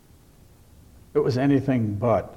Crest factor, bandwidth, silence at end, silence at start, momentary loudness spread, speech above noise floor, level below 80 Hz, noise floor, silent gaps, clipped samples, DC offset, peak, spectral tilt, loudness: 16 dB; 12.5 kHz; 0 s; 1.15 s; 4 LU; 31 dB; -52 dBFS; -52 dBFS; none; under 0.1%; under 0.1%; -8 dBFS; -8.5 dB/octave; -23 LUFS